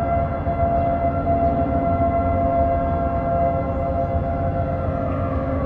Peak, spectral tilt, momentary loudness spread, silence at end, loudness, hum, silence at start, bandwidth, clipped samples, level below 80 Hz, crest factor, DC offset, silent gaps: -8 dBFS; -11.5 dB/octave; 4 LU; 0 s; -21 LUFS; none; 0 s; 4.3 kHz; under 0.1%; -30 dBFS; 12 dB; under 0.1%; none